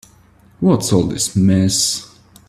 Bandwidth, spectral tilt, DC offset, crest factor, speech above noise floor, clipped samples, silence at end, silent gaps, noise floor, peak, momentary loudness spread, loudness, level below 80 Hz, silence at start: 14 kHz; -5 dB/octave; under 0.1%; 16 dB; 34 dB; under 0.1%; 0.45 s; none; -49 dBFS; 0 dBFS; 5 LU; -16 LUFS; -46 dBFS; 0.6 s